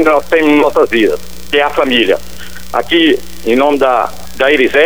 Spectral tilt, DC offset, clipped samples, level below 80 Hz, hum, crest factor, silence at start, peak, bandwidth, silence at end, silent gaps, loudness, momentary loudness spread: -4 dB/octave; 6%; under 0.1%; -38 dBFS; none; 12 dB; 0 s; 0 dBFS; over 20 kHz; 0 s; none; -11 LUFS; 9 LU